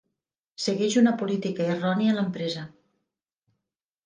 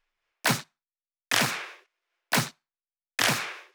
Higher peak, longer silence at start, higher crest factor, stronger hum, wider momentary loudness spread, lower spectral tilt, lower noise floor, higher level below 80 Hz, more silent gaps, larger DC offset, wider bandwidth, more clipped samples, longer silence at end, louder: about the same, -8 dBFS vs -6 dBFS; first, 0.6 s vs 0.45 s; second, 18 dB vs 24 dB; neither; about the same, 10 LU vs 11 LU; first, -5.5 dB/octave vs -2 dB/octave; second, -85 dBFS vs under -90 dBFS; about the same, -74 dBFS vs -76 dBFS; neither; neither; second, 9.8 kHz vs over 20 kHz; neither; first, 1.35 s vs 0.1 s; about the same, -25 LUFS vs -27 LUFS